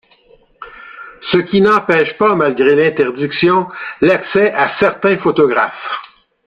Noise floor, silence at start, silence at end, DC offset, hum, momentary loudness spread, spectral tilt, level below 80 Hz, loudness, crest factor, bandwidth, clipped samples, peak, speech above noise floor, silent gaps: -49 dBFS; 0.6 s; 0.4 s; under 0.1%; none; 14 LU; -7.5 dB/octave; -52 dBFS; -13 LUFS; 14 dB; 6.6 kHz; under 0.1%; 0 dBFS; 36 dB; none